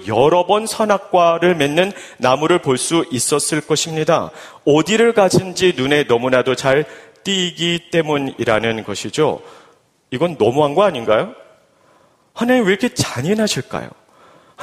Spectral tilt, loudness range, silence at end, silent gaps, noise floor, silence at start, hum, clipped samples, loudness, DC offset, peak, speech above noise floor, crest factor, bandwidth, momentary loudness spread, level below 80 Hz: -4 dB/octave; 4 LU; 0 s; none; -54 dBFS; 0 s; none; under 0.1%; -16 LUFS; under 0.1%; 0 dBFS; 38 dB; 16 dB; 15.5 kHz; 8 LU; -52 dBFS